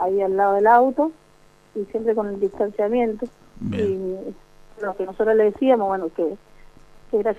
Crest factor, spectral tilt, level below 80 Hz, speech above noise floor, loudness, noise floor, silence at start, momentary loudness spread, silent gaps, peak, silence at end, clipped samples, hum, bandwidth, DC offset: 18 dB; -8 dB/octave; -52 dBFS; 32 dB; -21 LUFS; -53 dBFS; 0 s; 16 LU; none; -4 dBFS; 0 s; under 0.1%; none; 8.2 kHz; under 0.1%